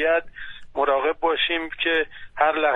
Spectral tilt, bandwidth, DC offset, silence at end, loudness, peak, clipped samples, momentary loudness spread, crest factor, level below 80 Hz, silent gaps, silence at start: -4.5 dB/octave; 4.1 kHz; under 0.1%; 0 s; -23 LUFS; -6 dBFS; under 0.1%; 11 LU; 16 dB; -50 dBFS; none; 0 s